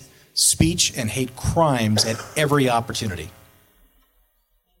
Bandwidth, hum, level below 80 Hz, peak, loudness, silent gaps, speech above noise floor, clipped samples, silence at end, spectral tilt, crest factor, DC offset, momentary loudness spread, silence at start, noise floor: 17 kHz; none; -42 dBFS; -2 dBFS; -20 LUFS; none; 45 dB; under 0.1%; 1.5 s; -3.5 dB/octave; 20 dB; under 0.1%; 10 LU; 0 s; -66 dBFS